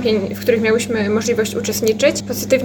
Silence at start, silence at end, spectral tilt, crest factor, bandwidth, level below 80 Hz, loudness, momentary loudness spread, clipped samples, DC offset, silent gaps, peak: 0 s; 0 s; -4 dB/octave; 16 dB; 19.5 kHz; -50 dBFS; -17 LUFS; 3 LU; under 0.1%; under 0.1%; none; -2 dBFS